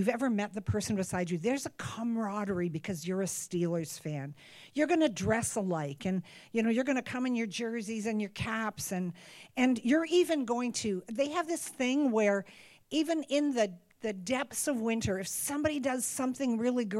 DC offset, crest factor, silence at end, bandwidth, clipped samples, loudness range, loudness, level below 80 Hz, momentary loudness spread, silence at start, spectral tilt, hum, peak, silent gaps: under 0.1%; 18 dB; 0 s; 16.5 kHz; under 0.1%; 3 LU; -32 LUFS; -64 dBFS; 9 LU; 0 s; -4.5 dB/octave; none; -14 dBFS; none